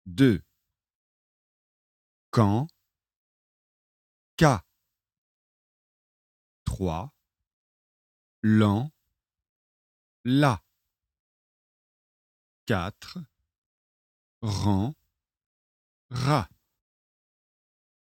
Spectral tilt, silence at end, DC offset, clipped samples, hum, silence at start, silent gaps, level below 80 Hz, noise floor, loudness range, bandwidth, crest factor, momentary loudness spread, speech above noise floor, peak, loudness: -7 dB/octave; 1.75 s; under 0.1%; under 0.1%; none; 0.05 s; 0.95-2.32 s, 3.16-4.38 s, 5.18-6.66 s, 7.53-8.43 s, 9.49-10.24 s, 11.20-12.66 s, 13.58-14.41 s, 15.46-16.09 s; -52 dBFS; -82 dBFS; 10 LU; 16 kHz; 26 dB; 18 LU; 59 dB; -6 dBFS; -26 LUFS